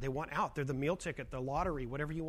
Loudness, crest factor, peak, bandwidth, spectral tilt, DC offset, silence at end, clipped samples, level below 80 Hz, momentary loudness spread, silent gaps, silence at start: -37 LUFS; 14 dB; -22 dBFS; 15 kHz; -6.5 dB/octave; under 0.1%; 0 s; under 0.1%; -50 dBFS; 4 LU; none; 0 s